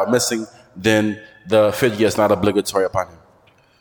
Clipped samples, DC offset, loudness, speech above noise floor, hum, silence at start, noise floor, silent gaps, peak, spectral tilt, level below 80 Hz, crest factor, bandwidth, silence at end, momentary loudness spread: under 0.1%; under 0.1%; -18 LUFS; 36 dB; none; 0 s; -54 dBFS; none; -2 dBFS; -4.5 dB/octave; -52 dBFS; 16 dB; 19 kHz; 0.75 s; 10 LU